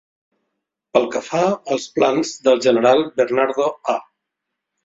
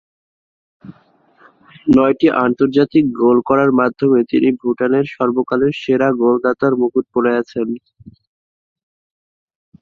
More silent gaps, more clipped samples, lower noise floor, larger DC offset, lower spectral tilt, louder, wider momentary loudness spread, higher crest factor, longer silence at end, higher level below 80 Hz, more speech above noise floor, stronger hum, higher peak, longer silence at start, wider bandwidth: neither; neither; first, -80 dBFS vs -53 dBFS; neither; second, -4.5 dB/octave vs -8.5 dB/octave; second, -18 LUFS vs -15 LUFS; first, 8 LU vs 5 LU; about the same, 18 dB vs 16 dB; second, 0.85 s vs 2.05 s; second, -64 dBFS vs -54 dBFS; first, 62 dB vs 39 dB; neither; about the same, -2 dBFS vs 0 dBFS; about the same, 0.95 s vs 0.85 s; first, 7.8 kHz vs 6.6 kHz